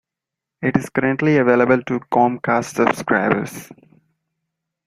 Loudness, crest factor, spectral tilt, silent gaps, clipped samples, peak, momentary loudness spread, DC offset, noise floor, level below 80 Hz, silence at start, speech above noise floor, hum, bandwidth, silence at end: -18 LUFS; 18 dB; -6.5 dB/octave; none; under 0.1%; -2 dBFS; 7 LU; under 0.1%; -85 dBFS; -56 dBFS; 0.6 s; 67 dB; none; 16 kHz; 1.15 s